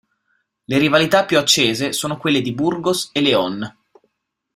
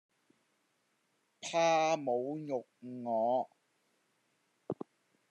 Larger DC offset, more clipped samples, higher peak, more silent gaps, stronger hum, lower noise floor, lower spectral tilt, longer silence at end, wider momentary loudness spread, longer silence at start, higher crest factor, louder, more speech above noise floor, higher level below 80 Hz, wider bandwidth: neither; neither; first, 0 dBFS vs -18 dBFS; neither; neither; second, -68 dBFS vs -78 dBFS; about the same, -3.5 dB/octave vs -4 dB/octave; first, 0.85 s vs 0.6 s; second, 7 LU vs 17 LU; second, 0.7 s vs 1.4 s; about the same, 18 dB vs 18 dB; first, -17 LUFS vs -34 LUFS; first, 51 dB vs 45 dB; first, -56 dBFS vs under -90 dBFS; first, 16 kHz vs 10.5 kHz